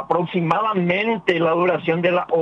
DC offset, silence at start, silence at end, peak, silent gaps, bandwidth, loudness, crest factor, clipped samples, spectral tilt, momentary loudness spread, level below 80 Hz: under 0.1%; 0 s; 0 s; -4 dBFS; none; 7.6 kHz; -19 LUFS; 16 dB; under 0.1%; -8 dB/octave; 2 LU; -62 dBFS